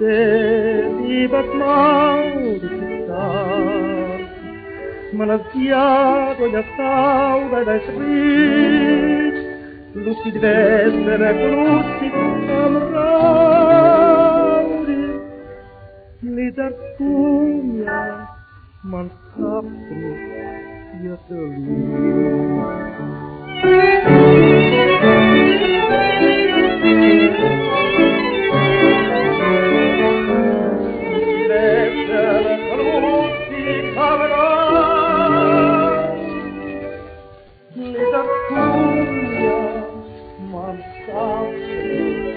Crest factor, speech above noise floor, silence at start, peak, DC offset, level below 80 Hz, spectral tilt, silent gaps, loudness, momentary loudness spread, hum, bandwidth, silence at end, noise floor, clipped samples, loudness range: 16 dB; 28 dB; 0 s; 0 dBFS; under 0.1%; -44 dBFS; -4.5 dB/octave; none; -15 LUFS; 18 LU; none; 4.8 kHz; 0 s; -43 dBFS; under 0.1%; 10 LU